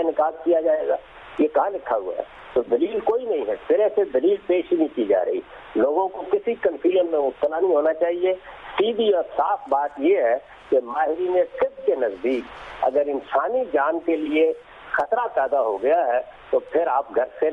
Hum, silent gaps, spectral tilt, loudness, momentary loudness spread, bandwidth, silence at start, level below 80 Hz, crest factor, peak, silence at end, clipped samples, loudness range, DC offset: none; none; -6.5 dB/octave; -22 LUFS; 6 LU; 4.9 kHz; 0 s; -58 dBFS; 12 dB; -10 dBFS; 0 s; under 0.1%; 1 LU; under 0.1%